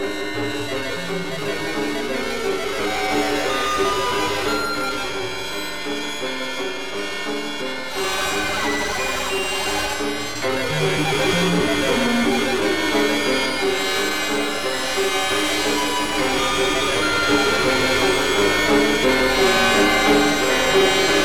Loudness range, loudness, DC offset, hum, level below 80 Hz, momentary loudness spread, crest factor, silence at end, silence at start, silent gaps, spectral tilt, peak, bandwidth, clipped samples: 7 LU; -20 LUFS; 2%; none; -42 dBFS; 10 LU; 14 dB; 0 s; 0 s; none; -3 dB/octave; -6 dBFS; over 20 kHz; under 0.1%